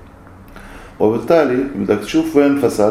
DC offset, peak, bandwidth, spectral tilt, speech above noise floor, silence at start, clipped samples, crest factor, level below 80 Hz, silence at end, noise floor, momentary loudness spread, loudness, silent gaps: under 0.1%; 0 dBFS; 15.5 kHz; -6 dB/octave; 25 dB; 0.4 s; under 0.1%; 16 dB; -44 dBFS; 0 s; -39 dBFS; 5 LU; -15 LUFS; none